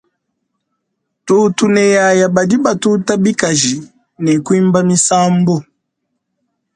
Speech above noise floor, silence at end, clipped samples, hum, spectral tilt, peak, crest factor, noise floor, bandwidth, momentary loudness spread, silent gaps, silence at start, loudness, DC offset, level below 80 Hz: 60 dB; 1.15 s; under 0.1%; none; -4.5 dB/octave; 0 dBFS; 14 dB; -72 dBFS; 11 kHz; 6 LU; none; 1.25 s; -12 LUFS; under 0.1%; -56 dBFS